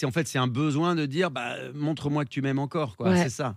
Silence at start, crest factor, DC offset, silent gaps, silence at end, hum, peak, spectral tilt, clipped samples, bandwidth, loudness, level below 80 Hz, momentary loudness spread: 0 s; 16 dB; under 0.1%; none; 0 s; none; -12 dBFS; -6 dB/octave; under 0.1%; 15 kHz; -27 LUFS; -66 dBFS; 6 LU